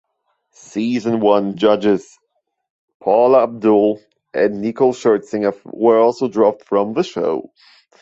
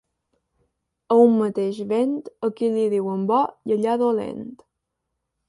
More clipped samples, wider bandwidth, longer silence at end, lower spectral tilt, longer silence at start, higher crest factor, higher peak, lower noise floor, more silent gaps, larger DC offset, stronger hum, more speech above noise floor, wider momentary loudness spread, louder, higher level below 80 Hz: neither; second, 8 kHz vs 11.5 kHz; second, 0.6 s vs 0.95 s; second, -6.5 dB/octave vs -8 dB/octave; second, 0.75 s vs 1.1 s; about the same, 16 dB vs 18 dB; about the same, -2 dBFS vs -4 dBFS; second, -71 dBFS vs -79 dBFS; first, 2.70-2.88 s, 2.94-3.00 s vs none; neither; neither; second, 55 dB vs 59 dB; about the same, 9 LU vs 11 LU; first, -17 LUFS vs -21 LUFS; first, -62 dBFS vs -68 dBFS